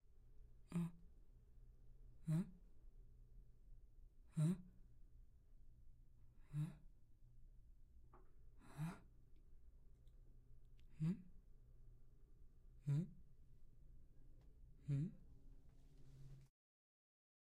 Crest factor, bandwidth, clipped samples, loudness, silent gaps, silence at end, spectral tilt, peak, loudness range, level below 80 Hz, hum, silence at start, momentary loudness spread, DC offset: 20 dB; 14 kHz; under 0.1%; -48 LUFS; none; 1 s; -8.5 dB/octave; -32 dBFS; 8 LU; -64 dBFS; none; 0.05 s; 24 LU; under 0.1%